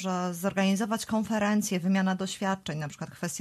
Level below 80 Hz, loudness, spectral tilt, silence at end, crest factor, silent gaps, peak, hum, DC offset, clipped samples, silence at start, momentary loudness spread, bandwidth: -66 dBFS; -29 LUFS; -5 dB/octave; 0 s; 14 dB; none; -14 dBFS; none; under 0.1%; under 0.1%; 0 s; 9 LU; 13.5 kHz